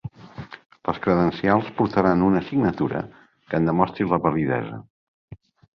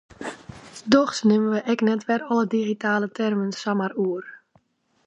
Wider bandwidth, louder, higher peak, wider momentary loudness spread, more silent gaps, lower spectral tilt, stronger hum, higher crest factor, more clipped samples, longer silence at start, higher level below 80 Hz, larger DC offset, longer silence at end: second, 6.2 kHz vs 9.6 kHz; about the same, -22 LUFS vs -23 LUFS; about the same, -2 dBFS vs -2 dBFS; first, 19 LU vs 16 LU; first, 0.66-0.70 s, 4.90-5.28 s vs none; first, -9.5 dB/octave vs -5.5 dB/octave; neither; about the same, 20 dB vs 22 dB; neither; second, 0.05 s vs 0.2 s; first, -50 dBFS vs -62 dBFS; neither; second, 0.4 s vs 0.7 s